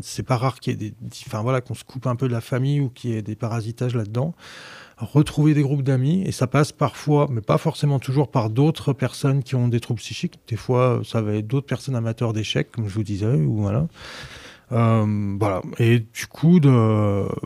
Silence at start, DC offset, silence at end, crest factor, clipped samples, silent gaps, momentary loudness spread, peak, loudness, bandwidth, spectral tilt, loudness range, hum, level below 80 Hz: 0 s; under 0.1%; 0 s; 16 dB; under 0.1%; none; 11 LU; -4 dBFS; -22 LUFS; 14 kHz; -7 dB/octave; 5 LU; none; -52 dBFS